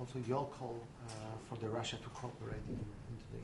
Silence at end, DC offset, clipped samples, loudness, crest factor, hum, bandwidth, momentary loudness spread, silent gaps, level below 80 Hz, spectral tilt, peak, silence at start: 0 s; under 0.1%; under 0.1%; -44 LUFS; 18 dB; none; 11.5 kHz; 9 LU; none; -60 dBFS; -5.5 dB/octave; -24 dBFS; 0 s